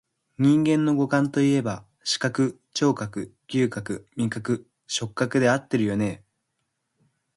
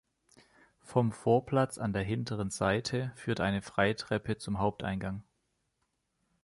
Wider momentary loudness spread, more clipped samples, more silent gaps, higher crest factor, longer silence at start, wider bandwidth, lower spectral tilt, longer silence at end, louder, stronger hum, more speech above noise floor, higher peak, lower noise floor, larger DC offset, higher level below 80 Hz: first, 11 LU vs 7 LU; neither; neither; about the same, 16 dB vs 20 dB; second, 0.4 s vs 0.85 s; about the same, 11.5 kHz vs 11.5 kHz; about the same, -5.5 dB/octave vs -6 dB/octave; about the same, 1.2 s vs 1.2 s; first, -24 LUFS vs -32 LUFS; neither; first, 54 dB vs 49 dB; first, -8 dBFS vs -12 dBFS; about the same, -77 dBFS vs -80 dBFS; neither; about the same, -60 dBFS vs -56 dBFS